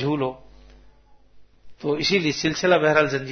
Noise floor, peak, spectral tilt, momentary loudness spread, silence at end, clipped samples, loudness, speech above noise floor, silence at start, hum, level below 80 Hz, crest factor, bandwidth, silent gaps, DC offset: -51 dBFS; -4 dBFS; -4.5 dB/octave; 11 LU; 0 s; under 0.1%; -21 LUFS; 30 dB; 0 s; none; -54 dBFS; 20 dB; 6.6 kHz; none; under 0.1%